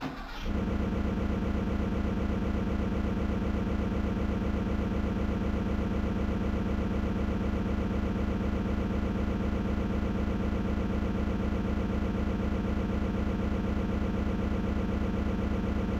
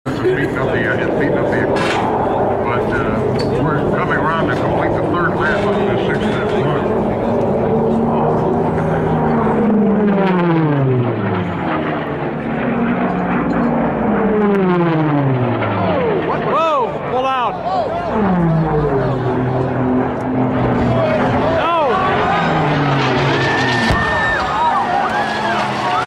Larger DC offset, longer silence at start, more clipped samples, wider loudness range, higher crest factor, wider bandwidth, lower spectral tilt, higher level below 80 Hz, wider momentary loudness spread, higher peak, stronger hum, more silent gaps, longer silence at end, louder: neither; about the same, 0 s vs 0.05 s; neither; about the same, 0 LU vs 2 LU; about the same, 10 dB vs 14 dB; second, 8 kHz vs 11.5 kHz; about the same, -8 dB/octave vs -7.5 dB/octave; about the same, -34 dBFS vs -36 dBFS; second, 0 LU vs 3 LU; second, -20 dBFS vs -2 dBFS; neither; neither; about the same, 0 s vs 0 s; second, -31 LUFS vs -16 LUFS